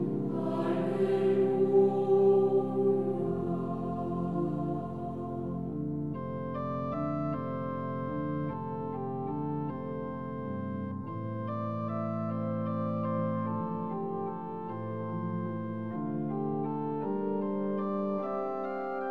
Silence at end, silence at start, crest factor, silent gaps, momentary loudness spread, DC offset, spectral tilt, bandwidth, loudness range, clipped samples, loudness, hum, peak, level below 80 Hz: 0 s; 0 s; 16 dB; none; 10 LU; 0.2%; -10.5 dB/octave; 4.6 kHz; 8 LU; under 0.1%; -32 LUFS; none; -14 dBFS; -64 dBFS